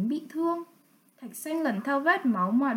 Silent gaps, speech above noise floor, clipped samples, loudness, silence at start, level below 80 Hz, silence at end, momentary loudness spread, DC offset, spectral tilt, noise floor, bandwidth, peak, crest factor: none; 35 dB; under 0.1%; -28 LUFS; 0 s; -82 dBFS; 0 s; 18 LU; under 0.1%; -5.5 dB/octave; -62 dBFS; 17 kHz; -12 dBFS; 16 dB